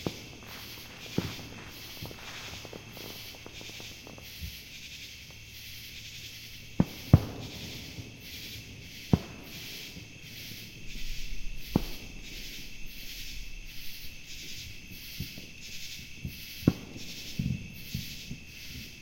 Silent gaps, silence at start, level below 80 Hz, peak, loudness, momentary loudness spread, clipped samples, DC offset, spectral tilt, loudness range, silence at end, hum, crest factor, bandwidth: none; 0 s; -46 dBFS; -4 dBFS; -37 LUFS; 13 LU; under 0.1%; under 0.1%; -5 dB/octave; 10 LU; 0 s; none; 32 dB; 16.5 kHz